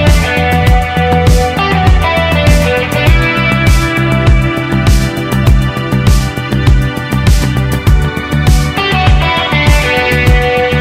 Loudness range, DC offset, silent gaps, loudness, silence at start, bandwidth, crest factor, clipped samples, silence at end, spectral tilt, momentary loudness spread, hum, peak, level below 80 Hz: 2 LU; under 0.1%; none; -10 LUFS; 0 s; 16 kHz; 10 dB; under 0.1%; 0 s; -5.5 dB/octave; 4 LU; none; 0 dBFS; -14 dBFS